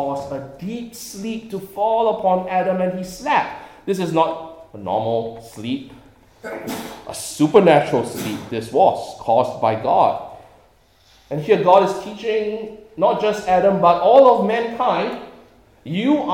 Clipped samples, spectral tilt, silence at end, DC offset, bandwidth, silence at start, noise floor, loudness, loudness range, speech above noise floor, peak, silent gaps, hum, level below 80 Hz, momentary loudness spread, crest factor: under 0.1%; -5.5 dB/octave; 0 s; under 0.1%; 17.5 kHz; 0 s; -54 dBFS; -18 LUFS; 6 LU; 36 dB; 0 dBFS; none; none; -56 dBFS; 17 LU; 18 dB